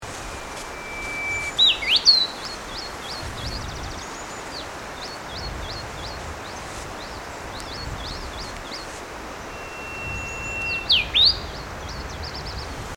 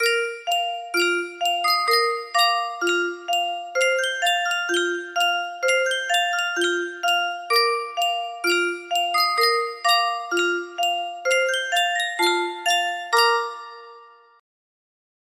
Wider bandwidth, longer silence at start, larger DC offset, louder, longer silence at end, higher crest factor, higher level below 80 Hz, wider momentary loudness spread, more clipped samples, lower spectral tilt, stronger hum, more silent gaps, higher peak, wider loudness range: first, 19 kHz vs 15.5 kHz; about the same, 0 s vs 0 s; neither; second, -24 LUFS vs -21 LUFS; second, 0 s vs 1.3 s; about the same, 22 dB vs 18 dB; first, -40 dBFS vs -76 dBFS; first, 18 LU vs 5 LU; neither; first, -2 dB/octave vs 0.5 dB/octave; neither; neither; about the same, -4 dBFS vs -6 dBFS; first, 13 LU vs 1 LU